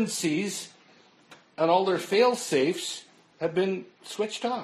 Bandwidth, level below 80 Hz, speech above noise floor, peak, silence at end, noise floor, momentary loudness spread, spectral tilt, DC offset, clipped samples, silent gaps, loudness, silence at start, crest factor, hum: 13 kHz; -78 dBFS; 31 dB; -8 dBFS; 0 s; -58 dBFS; 15 LU; -4 dB/octave; under 0.1%; under 0.1%; none; -27 LUFS; 0 s; 18 dB; none